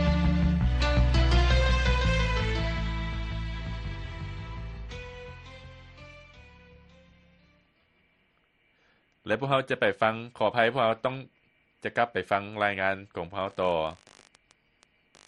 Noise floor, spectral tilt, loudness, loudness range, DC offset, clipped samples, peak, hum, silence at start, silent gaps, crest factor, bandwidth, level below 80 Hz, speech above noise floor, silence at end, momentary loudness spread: -69 dBFS; -6 dB/octave; -28 LUFS; 17 LU; under 0.1%; under 0.1%; -8 dBFS; none; 0 s; none; 22 dB; 8.8 kHz; -32 dBFS; 41 dB; 1.35 s; 20 LU